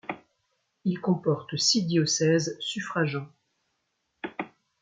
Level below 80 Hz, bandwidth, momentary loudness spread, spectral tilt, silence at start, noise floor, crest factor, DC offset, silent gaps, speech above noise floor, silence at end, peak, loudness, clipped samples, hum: -72 dBFS; 9.4 kHz; 17 LU; -4 dB/octave; 0.1 s; -77 dBFS; 18 dB; under 0.1%; none; 51 dB; 0.35 s; -10 dBFS; -26 LUFS; under 0.1%; none